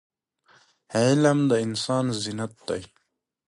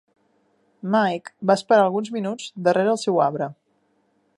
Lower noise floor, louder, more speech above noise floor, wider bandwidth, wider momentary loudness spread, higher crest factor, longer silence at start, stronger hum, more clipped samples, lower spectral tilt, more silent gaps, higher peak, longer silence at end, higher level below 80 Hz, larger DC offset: second, -61 dBFS vs -66 dBFS; second, -24 LUFS vs -21 LUFS; second, 38 dB vs 46 dB; about the same, 11.5 kHz vs 11.5 kHz; about the same, 13 LU vs 12 LU; about the same, 18 dB vs 20 dB; about the same, 0.9 s vs 0.85 s; neither; neither; about the same, -5.5 dB/octave vs -5.5 dB/octave; neither; second, -8 dBFS vs -2 dBFS; second, 0.65 s vs 0.85 s; first, -62 dBFS vs -76 dBFS; neither